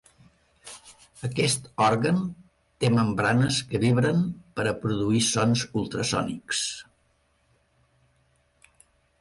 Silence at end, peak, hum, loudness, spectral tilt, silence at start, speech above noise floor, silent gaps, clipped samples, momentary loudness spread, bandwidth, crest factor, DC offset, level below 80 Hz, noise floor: 2.4 s; -10 dBFS; none; -25 LUFS; -4.5 dB/octave; 0.65 s; 43 dB; none; under 0.1%; 14 LU; 11.5 kHz; 16 dB; under 0.1%; -56 dBFS; -67 dBFS